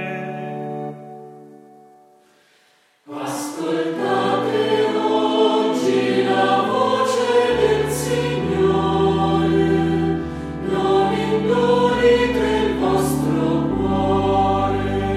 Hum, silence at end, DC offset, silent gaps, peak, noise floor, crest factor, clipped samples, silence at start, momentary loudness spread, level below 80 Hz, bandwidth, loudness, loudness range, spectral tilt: none; 0 s; under 0.1%; none; -4 dBFS; -58 dBFS; 14 dB; under 0.1%; 0 s; 11 LU; -40 dBFS; 15.5 kHz; -19 LUFS; 9 LU; -6 dB/octave